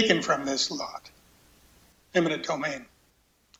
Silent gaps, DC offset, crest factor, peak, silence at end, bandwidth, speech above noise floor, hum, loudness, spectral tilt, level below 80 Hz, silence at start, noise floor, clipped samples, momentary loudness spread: none; under 0.1%; 24 dB; -6 dBFS; 0.75 s; 16 kHz; 39 dB; none; -28 LUFS; -3.5 dB/octave; -64 dBFS; 0 s; -66 dBFS; under 0.1%; 14 LU